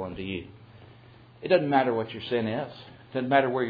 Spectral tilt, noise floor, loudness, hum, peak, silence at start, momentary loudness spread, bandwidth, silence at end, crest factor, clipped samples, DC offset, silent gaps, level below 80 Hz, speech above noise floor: -9 dB/octave; -52 dBFS; -27 LUFS; none; -8 dBFS; 0 s; 17 LU; 5 kHz; 0 s; 20 dB; under 0.1%; under 0.1%; none; -62 dBFS; 26 dB